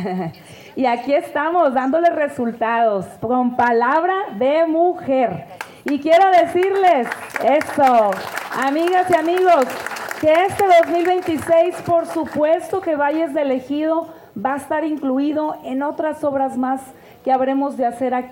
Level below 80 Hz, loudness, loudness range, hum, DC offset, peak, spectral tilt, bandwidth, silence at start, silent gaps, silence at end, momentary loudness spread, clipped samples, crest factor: -60 dBFS; -18 LUFS; 5 LU; none; under 0.1%; -6 dBFS; -5.5 dB/octave; 17 kHz; 0 s; none; 0 s; 10 LU; under 0.1%; 12 dB